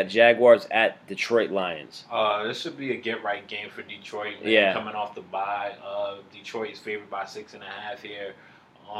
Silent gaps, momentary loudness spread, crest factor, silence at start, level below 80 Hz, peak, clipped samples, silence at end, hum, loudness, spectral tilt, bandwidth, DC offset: none; 19 LU; 22 dB; 0 s; -78 dBFS; -4 dBFS; under 0.1%; 0 s; none; -25 LUFS; -4.5 dB/octave; 11 kHz; under 0.1%